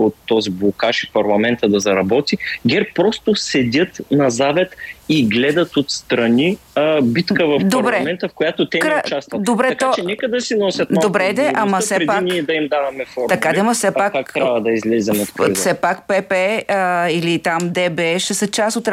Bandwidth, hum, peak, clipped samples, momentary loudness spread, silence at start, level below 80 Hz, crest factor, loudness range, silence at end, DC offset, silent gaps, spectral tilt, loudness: 16 kHz; none; -2 dBFS; under 0.1%; 4 LU; 0 s; -56 dBFS; 14 dB; 1 LU; 0 s; under 0.1%; none; -4.5 dB/octave; -17 LUFS